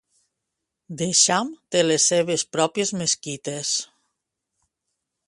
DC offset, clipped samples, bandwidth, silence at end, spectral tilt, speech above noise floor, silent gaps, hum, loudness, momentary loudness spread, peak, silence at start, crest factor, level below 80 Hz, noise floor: under 0.1%; under 0.1%; 11.5 kHz; 1.45 s; -2.5 dB/octave; 59 dB; none; none; -21 LUFS; 12 LU; -2 dBFS; 0.9 s; 22 dB; -68 dBFS; -82 dBFS